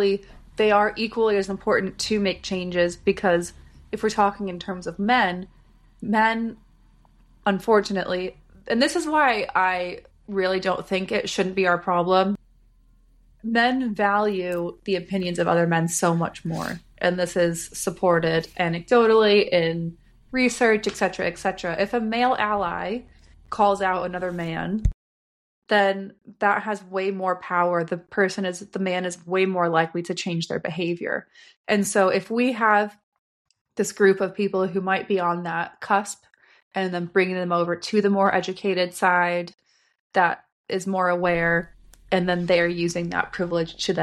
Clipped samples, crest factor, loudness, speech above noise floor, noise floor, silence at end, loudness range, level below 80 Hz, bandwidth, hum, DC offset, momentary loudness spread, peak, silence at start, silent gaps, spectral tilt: under 0.1%; 18 dB; -23 LUFS; 34 dB; -56 dBFS; 0 s; 4 LU; -46 dBFS; 13.5 kHz; none; under 0.1%; 9 LU; -6 dBFS; 0 s; 24.94-25.62 s, 31.56-31.64 s, 33.03-33.12 s, 33.19-33.45 s, 33.61-33.65 s, 36.62-36.71 s, 40.00-40.10 s, 40.52-40.64 s; -5 dB/octave